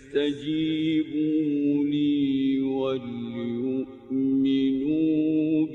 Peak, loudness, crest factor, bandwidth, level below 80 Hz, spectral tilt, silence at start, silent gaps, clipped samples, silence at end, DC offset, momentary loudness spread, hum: -14 dBFS; -25 LUFS; 12 dB; 4.2 kHz; -62 dBFS; -8 dB/octave; 0 s; none; under 0.1%; 0 s; under 0.1%; 7 LU; none